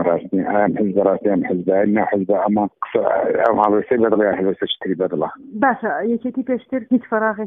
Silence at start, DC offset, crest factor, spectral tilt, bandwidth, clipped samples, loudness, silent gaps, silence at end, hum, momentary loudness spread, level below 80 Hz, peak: 0 s; under 0.1%; 18 dB; -9.5 dB/octave; 3.9 kHz; under 0.1%; -19 LUFS; none; 0 s; none; 6 LU; -58 dBFS; 0 dBFS